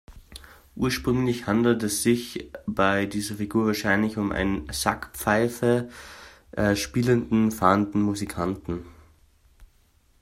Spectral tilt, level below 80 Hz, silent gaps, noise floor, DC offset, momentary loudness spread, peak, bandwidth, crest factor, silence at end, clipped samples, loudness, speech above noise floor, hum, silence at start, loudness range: -5 dB/octave; -48 dBFS; none; -61 dBFS; under 0.1%; 15 LU; -4 dBFS; 16 kHz; 22 dB; 0.55 s; under 0.1%; -25 LUFS; 37 dB; none; 0.1 s; 2 LU